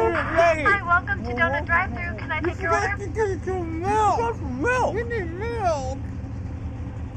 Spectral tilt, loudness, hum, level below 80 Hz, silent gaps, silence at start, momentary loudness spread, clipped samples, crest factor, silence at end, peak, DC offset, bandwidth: -6 dB/octave; -24 LUFS; none; -36 dBFS; none; 0 s; 13 LU; under 0.1%; 16 dB; 0 s; -8 dBFS; under 0.1%; 9.6 kHz